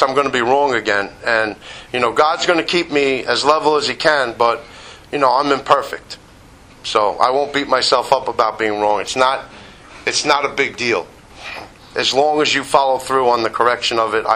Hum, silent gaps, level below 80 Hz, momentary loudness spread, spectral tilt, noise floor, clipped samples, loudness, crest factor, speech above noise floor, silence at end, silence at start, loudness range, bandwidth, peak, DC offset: none; none; -50 dBFS; 14 LU; -2.5 dB/octave; -43 dBFS; under 0.1%; -16 LUFS; 16 dB; 27 dB; 0 s; 0 s; 2 LU; 15.5 kHz; 0 dBFS; under 0.1%